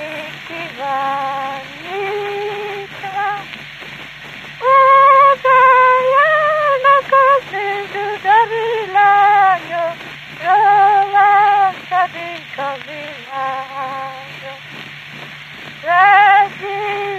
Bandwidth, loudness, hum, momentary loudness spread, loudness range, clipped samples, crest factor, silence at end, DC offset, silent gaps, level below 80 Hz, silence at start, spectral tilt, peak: 14 kHz; -13 LUFS; none; 21 LU; 12 LU; under 0.1%; 14 dB; 0 s; under 0.1%; none; -60 dBFS; 0 s; -4 dB/octave; 0 dBFS